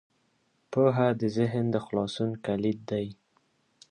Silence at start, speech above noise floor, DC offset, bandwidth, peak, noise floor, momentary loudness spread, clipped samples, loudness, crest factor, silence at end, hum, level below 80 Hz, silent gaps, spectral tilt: 0.7 s; 44 dB; under 0.1%; 10 kHz; -10 dBFS; -71 dBFS; 9 LU; under 0.1%; -28 LUFS; 18 dB; 0.8 s; none; -64 dBFS; none; -7.5 dB/octave